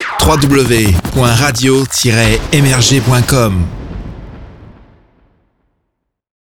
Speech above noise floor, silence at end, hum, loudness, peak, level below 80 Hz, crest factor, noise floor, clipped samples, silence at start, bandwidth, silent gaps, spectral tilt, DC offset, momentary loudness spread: 60 dB; 1.75 s; none; -10 LUFS; 0 dBFS; -26 dBFS; 12 dB; -70 dBFS; under 0.1%; 0 s; 19 kHz; none; -4.5 dB/octave; under 0.1%; 17 LU